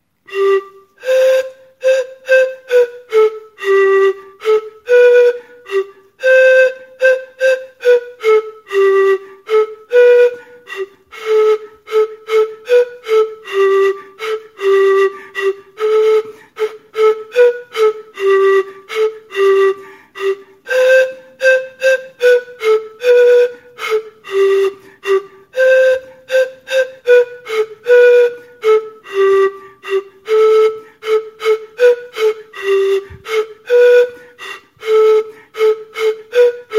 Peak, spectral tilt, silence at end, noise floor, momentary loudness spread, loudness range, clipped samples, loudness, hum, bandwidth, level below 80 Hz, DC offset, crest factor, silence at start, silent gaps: 0 dBFS; -2.5 dB/octave; 0 s; -32 dBFS; 13 LU; 3 LU; under 0.1%; -14 LUFS; none; 13.5 kHz; -64 dBFS; under 0.1%; 12 dB; 0.3 s; none